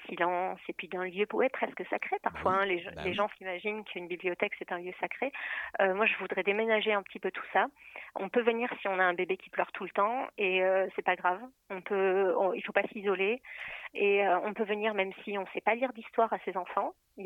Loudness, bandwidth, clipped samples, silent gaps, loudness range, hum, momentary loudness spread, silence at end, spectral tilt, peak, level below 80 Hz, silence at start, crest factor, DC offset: -31 LUFS; 6.4 kHz; under 0.1%; none; 3 LU; none; 10 LU; 0 s; -6.5 dB/octave; -12 dBFS; -70 dBFS; 0 s; 20 dB; under 0.1%